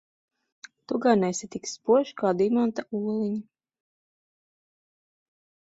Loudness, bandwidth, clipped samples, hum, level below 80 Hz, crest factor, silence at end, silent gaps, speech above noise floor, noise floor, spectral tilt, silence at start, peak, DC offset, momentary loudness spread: -26 LUFS; 8 kHz; under 0.1%; none; -70 dBFS; 20 dB; 2.35 s; none; over 65 dB; under -90 dBFS; -5.5 dB/octave; 0.9 s; -8 dBFS; under 0.1%; 10 LU